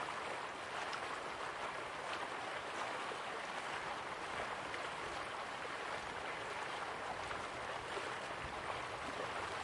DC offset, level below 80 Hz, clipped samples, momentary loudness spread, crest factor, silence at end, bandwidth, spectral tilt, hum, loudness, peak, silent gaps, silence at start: under 0.1%; -68 dBFS; under 0.1%; 2 LU; 16 dB; 0 s; 11.5 kHz; -2.5 dB/octave; none; -43 LUFS; -26 dBFS; none; 0 s